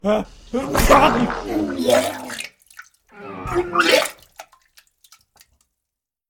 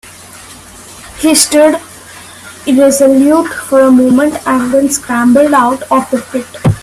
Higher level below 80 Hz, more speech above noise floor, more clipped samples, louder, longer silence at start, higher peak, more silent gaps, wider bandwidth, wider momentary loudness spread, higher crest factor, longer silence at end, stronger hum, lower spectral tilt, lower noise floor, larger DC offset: first, -34 dBFS vs -42 dBFS; first, 66 dB vs 24 dB; neither; second, -19 LUFS vs -9 LUFS; about the same, 0.05 s vs 0.05 s; about the same, -2 dBFS vs 0 dBFS; neither; first, 18 kHz vs 15 kHz; second, 20 LU vs 23 LU; first, 20 dB vs 10 dB; first, 1.9 s vs 0 s; neither; about the same, -4 dB/octave vs -4.5 dB/octave; first, -83 dBFS vs -33 dBFS; neither